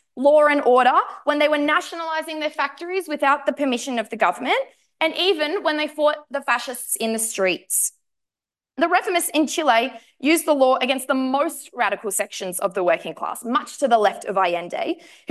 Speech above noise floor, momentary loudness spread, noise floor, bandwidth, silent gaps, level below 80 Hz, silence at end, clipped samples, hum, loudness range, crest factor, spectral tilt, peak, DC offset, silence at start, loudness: over 69 dB; 9 LU; under -90 dBFS; 13 kHz; none; -76 dBFS; 0.35 s; under 0.1%; none; 3 LU; 16 dB; -2 dB/octave; -4 dBFS; under 0.1%; 0.15 s; -21 LUFS